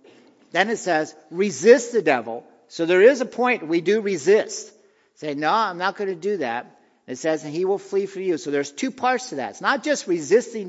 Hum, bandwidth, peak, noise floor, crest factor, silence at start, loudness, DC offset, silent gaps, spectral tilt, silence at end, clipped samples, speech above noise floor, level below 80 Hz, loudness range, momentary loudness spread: none; 8 kHz; 0 dBFS; -52 dBFS; 22 dB; 0.55 s; -21 LUFS; under 0.1%; none; -4 dB/octave; 0 s; under 0.1%; 31 dB; -80 dBFS; 6 LU; 15 LU